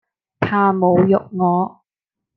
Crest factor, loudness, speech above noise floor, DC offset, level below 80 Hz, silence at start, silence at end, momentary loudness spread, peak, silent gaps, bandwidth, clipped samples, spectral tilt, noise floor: 16 dB; -17 LUFS; 69 dB; under 0.1%; -60 dBFS; 0.4 s; 0.7 s; 8 LU; -2 dBFS; none; 5 kHz; under 0.1%; -10.5 dB/octave; -85 dBFS